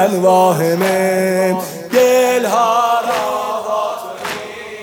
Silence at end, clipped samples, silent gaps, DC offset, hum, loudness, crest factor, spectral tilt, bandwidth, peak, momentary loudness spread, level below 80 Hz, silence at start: 0 s; under 0.1%; none; under 0.1%; none; -15 LUFS; 14 dB; -4.5 dB/octave; 19 kHz; 0 dBFS; 12 LU; -62 dBFS; 0 s